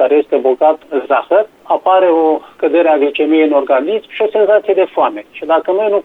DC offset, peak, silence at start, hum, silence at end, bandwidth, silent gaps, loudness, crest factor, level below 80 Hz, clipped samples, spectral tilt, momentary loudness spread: under 0.1%; 0 dBFS; 0 s; none; 0.05 s; 4.1 kHz; none; -13 LUFS; 12 dB; -62 dBFS; under 0.1%; -6 dB/octave; 6 LU